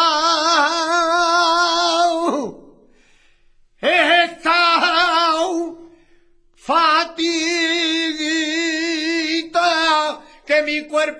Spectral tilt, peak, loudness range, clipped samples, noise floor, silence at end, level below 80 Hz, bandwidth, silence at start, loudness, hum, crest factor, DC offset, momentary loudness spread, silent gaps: -1 dB/octave; -2 dBFS; 2 LU; under 0.1%; -53 dBFS; 0 s; -56 dBFS; 10.5 kHz; 0 s; -17 LUFS; none; 16 dB; under 0.1%; 8 LU; none